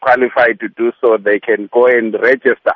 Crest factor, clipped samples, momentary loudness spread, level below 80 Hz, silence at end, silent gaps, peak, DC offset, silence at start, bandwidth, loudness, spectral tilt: 12 dB; under 0.1%; 4 LU; -58 dBFS; 0 s; none; 0 dBFS; under 0.1%; 0 s; 5.8 kHz; -13 LUFS; -7 dB/octave